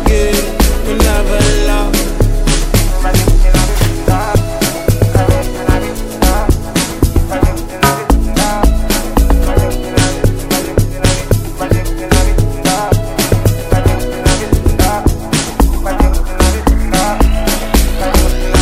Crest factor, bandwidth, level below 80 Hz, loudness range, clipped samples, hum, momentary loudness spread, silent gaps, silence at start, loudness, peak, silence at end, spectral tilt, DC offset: 10 dB; 16 kHz; -14 dBFS; 1 LU; under 0.1%; none; 3 LU; none; 0 s; -13 LUFS; 0 dBFS; 0 s; -5 dB/octave; under 0.1%